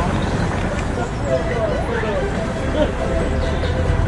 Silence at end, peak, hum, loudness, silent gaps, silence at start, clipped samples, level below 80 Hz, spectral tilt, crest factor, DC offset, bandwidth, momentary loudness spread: 0 s; -2 dBFS; none; -21 LUFS; none; 0 s; under 0.1%; -26 dBFS; -6.5 dB/octave; 16 dB; under 0.1%; 11.5 kHz; 3 LU